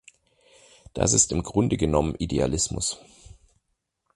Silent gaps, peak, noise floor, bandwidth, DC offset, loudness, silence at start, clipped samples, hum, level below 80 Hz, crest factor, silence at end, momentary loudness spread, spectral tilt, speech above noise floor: none; -4 dBFS; -77 dBFS; 11.5 kHz; under 0.1%; -23 LUFS; 0.95 s; under 0.1%; none; -40 dBFS; 22 dB; 1.2 s; 9 LU; -4 dB/octave; 53 dB